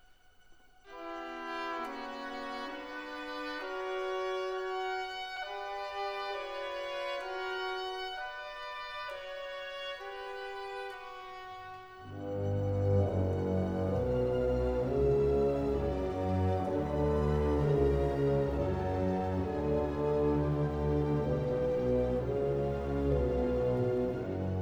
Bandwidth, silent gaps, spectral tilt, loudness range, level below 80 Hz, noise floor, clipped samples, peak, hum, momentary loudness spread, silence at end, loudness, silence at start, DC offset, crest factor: over 20 kHz; none; -7.5 dB/octave; 10 LU; -44 dBFS; -60 dBFS; under 0.1%; -18 dBFS; none; 12 LU; 0 s; -33 LUFS; 0.5 s; under 0.1%; 16 dB